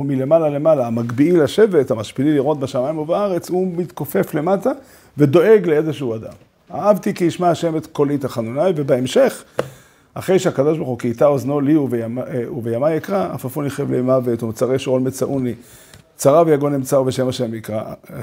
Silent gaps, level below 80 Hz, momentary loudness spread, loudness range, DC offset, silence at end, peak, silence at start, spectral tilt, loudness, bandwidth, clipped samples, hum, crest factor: none; -58 dBFS; 11 LU; 3 LU; under 0.1%; 0 s; 0 dBFS; 0 s; -6.5 dB/octave; -18 LUFS; 16 kHz; under 0.1%; none; 18 dB